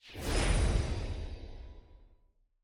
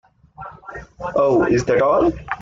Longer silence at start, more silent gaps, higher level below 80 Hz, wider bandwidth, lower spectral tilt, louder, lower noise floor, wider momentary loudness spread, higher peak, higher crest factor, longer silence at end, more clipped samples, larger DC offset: second, 0.05 s vs 0.4 s; neither; first, -36 dBFS vs -42 dBFS; first, 16 kHz vs 7.6 kHz; second, -5 dB/octave vs -6.5 dB/octave; second, -34 LUFS vs -17 LUFS; first, -68 dBFS vs -39 dBFS; about the same, 21 LU vs 21 LU; second, -16 dBFS vs -4 dBFS; about the same, 18 dB vs 14 dB; first, 0.6 s vs 0 s; neither; neither